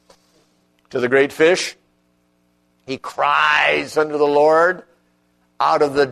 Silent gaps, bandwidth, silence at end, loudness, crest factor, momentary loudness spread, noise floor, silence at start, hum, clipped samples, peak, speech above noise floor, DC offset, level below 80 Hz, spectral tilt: none; 13.5 kHz; 0 s; -17 LUFS; 18 dB; 15 LU; -62 dBFS; 0.95 s; 60 Hz at -60 dBFS; under 0.1%; -2 dBFS; 46 dB; under 0.1%; -62 dBFS; -3.5 dB/octave